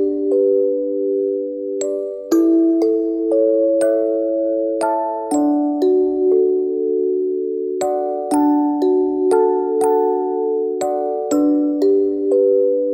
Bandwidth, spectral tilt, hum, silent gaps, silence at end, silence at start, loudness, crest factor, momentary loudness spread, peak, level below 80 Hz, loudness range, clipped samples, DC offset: 16.5 kHz; -5 dB/octave; none; none; 0 s; 0 s; -17 LUFS; 14 dB; 6 LU; -4 dBFS; -62 dBFS; 1 LU; under 0.1%; under 0.1%